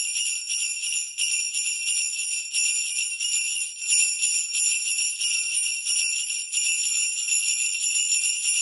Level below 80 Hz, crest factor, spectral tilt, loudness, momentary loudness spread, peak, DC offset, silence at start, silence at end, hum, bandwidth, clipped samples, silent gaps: -82 dBFS; 18 dB; 7.5 dB/octave; -22 LUFS; 4 LU; -8 dBFS; under 0.1%; 0 s; 0 s; none; 12 kHz; under 0.1%; none